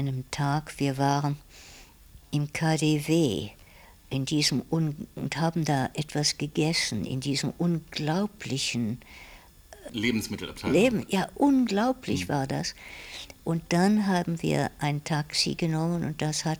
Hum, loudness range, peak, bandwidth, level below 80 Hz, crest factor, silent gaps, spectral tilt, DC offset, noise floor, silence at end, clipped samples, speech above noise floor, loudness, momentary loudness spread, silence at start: none; 3 LU; -10 dBFS; over 20 kHz; -54 dBFS; 18 dB; none; -5 dB/octave; under 0.1%; -52 dBFS; 0 s; under 0.1%; 25 dB; -27 LUFS; 11 LU; 0 s